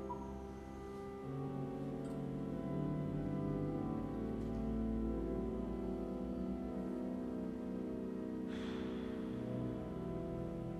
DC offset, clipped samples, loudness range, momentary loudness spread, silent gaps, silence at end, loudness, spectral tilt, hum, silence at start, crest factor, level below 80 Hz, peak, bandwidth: under 0.1%; under 0.1%; 2 LU; 5 LU; none; 0 s; -42 LUFS; -9 dB/octave; none; 0 s; 12 dB; -52 dBFS; -28 dBFS; 13 kHz